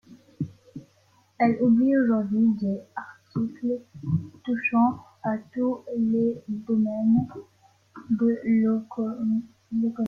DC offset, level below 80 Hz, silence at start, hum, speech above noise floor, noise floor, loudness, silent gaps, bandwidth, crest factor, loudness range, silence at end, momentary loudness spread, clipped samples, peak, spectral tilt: under 0.1%; -64 dBFS; 0.1 s; none; 38 dB; -62 dBFS; -25 LUFS; none; 4.7 kHz; 16 dB; 2 LU; 0 s; 14 LU; under 0.1%; -10 dBFS; -10 dB/octave